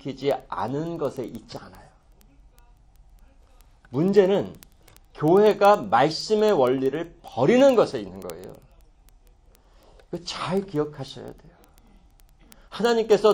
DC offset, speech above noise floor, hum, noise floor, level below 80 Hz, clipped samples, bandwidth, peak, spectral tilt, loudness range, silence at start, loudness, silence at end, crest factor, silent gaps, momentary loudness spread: under 0.1%; 33 dB; none; -55 dBFS; -54 dBFS; under 0.1%; 17 kHz; -4 dBFS; -6 dB/octave; 13 LU; 0.05 s; -22 LUFS; 0 s; 20 dB; none; 21 LU